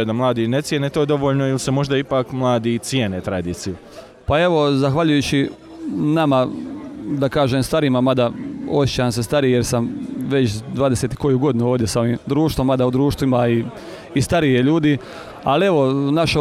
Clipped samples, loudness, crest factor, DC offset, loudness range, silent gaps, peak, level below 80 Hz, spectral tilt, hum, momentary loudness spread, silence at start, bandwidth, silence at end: under 0.1%; -19 LUFS; 12 dB; under 0.1%; 2 LU; none; -6 dBFS; -42 dBFS; -6 dB/octave; none; 10 LU; 0 s; 15 kHz; 0 s